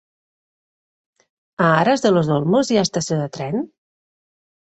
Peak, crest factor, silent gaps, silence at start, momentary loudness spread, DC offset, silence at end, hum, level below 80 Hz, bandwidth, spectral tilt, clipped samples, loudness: -2 dBFS; 18 dB; none; 1.6 s; 10 LU; under 0.1%; 1.1 s; none; -60 dBFS; 8.4 kHz; -5.5 dB/octave; under 0.1%; -18 LUFS